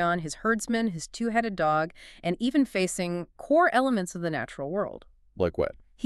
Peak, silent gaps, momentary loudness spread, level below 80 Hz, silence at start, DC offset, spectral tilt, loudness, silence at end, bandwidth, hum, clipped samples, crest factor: -10 dBFS; none; 10 LU; -54 dBFS; 0 s; under 0.1%; -5 dB/octave; -28 LUFS; 0 s; 13 kHz; none; under 0.1%; 18 dB